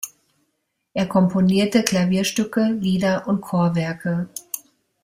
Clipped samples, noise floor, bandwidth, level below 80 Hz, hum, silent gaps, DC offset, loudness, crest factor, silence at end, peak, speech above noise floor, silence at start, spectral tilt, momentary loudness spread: under 0.1%; -74 dBFS; 16 kHz; -56 dBFS; none; none; under 0.1%; -21 LUFS; 22 dB; 0.45 s; 0 dBFS; 54 dB; 0 s; -5.5 dB/octave; 13 LU